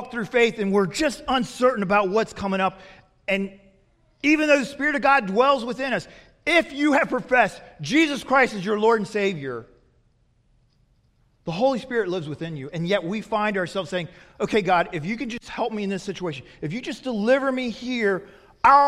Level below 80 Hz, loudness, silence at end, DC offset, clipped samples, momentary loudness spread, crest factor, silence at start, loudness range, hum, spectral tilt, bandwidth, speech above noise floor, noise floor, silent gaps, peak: -56 dBFS; -23 LUFS; 0 s; under 0.1%; under 0.1%; 12 LU; 20 dB; 0 s; 6 LU; none; -5 dB/octave; 14 kHz; 40 dB; -63 dBFS; none; -2 dBFS